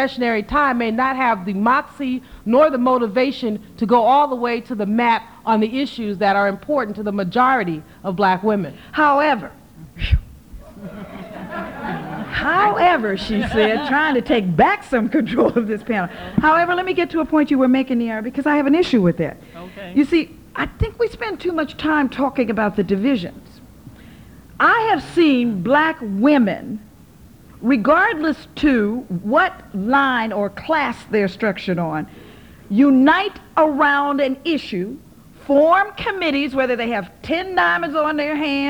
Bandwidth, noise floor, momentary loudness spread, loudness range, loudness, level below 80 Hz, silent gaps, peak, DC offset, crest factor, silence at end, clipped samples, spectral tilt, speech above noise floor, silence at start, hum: over 20 kHz; -45 dBFS; 11 LU; 4 LU; -18 LUFS; -38 dBFS; none; -2 dBFS; 0.1%; 18 dB; 0 s; under 0.1%; -7 dB/octave; 27 dB; 0 s; none